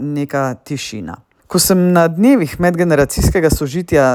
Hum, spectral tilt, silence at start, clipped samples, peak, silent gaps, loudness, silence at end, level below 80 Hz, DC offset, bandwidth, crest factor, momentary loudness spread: none; -5.5 dB/octave; 0 s; under 0.1%; 0 dBFS; none; -14 LUFS; 0 s; -30 dBFS; under 0.1%; over 20 kHz; 14 dB; 12 LU